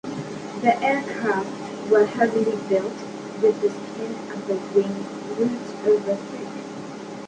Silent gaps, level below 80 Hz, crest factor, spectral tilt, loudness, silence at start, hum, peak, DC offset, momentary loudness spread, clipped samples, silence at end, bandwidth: none; -66 dBFS; 18 dB; -6 dB/octave; -24 LUFS; 0.05 s; none; -4 dBFS; under 0.1%; 13 LU; under 0.1%; 0 s; 9.4 kHz